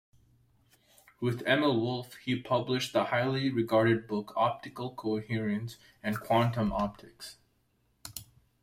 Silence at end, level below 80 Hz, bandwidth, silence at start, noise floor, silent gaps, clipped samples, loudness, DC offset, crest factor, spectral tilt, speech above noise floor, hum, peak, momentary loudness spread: 0.4 s; -58 dBFS; 16 kHz; 1.2 s; -72 dBFS; none; under 0.1%; -30 LUFS; under 0.1%; 18 dB; -6 dB/octave; 42 dB; none; -12 dBFS; 17 LU